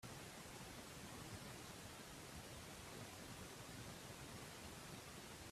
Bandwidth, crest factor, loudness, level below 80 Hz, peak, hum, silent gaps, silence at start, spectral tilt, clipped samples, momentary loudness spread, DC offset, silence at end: 15.5 kHz; 16 dB; -54 LUFS; -70 dBFS; -40 dBFS; none; none; 0 s; -3.5 dB/octave; under 0.1%; 1 LU; under 0.1%; 0 s